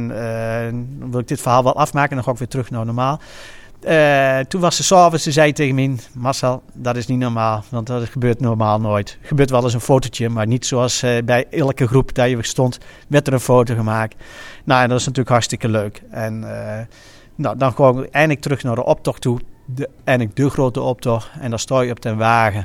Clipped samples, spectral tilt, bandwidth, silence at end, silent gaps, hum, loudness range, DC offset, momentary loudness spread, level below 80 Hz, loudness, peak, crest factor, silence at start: under 0.1%; -5.5 dB/octave; 16 kHz; 0 s; none; none; 4 LU; under 0.1%; 12 LU; -42 dBFS; -18 LUFS; 0 dBFS; 18 dB; 0 s